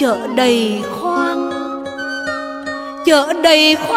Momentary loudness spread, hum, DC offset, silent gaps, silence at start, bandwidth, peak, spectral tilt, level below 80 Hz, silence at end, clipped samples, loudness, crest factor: 14 LU; none; under 0.1%; none; 0 s; 16 kHz; 0 dBFS; -3 dB/octave; -54 dBFS; 0 s; under 0.1%; -16 LUFS; 14 dB